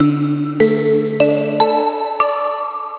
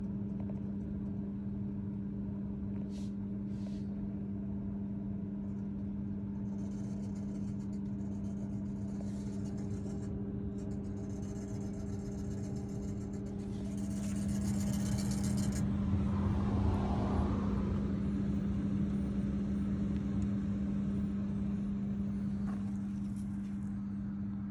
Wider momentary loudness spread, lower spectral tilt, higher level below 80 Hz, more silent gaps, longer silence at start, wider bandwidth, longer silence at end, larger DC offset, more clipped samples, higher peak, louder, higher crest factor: about the same, 5 LU vs 7 LU; first, -11 dB/octave vs -8 dB/octave; second, -58 dBFS vs -46 dBFS; neither; about the same, 0 s vs 0 s; second, 4 kHz vs 13 kHz; about the same, 0 s vs 0 s; neither; neither; first, 0 dBFS vs -20 dBFS; first, -16 LUFS vs -37 LUFS; about the same, 16 dB vs 16 dB